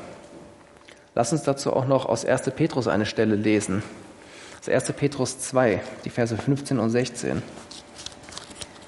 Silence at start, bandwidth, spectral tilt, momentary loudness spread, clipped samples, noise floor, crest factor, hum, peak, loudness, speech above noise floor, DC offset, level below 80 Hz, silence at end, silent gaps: 0 s; 11.5 kHz; -5.5 dB/octave; 18 LU; under 0.1%; -50 dBFS; 20 dB; none; -6 dBFS; -24 LUFS; 26 dB; under 0.1%; -60 dBFS; 0 s; none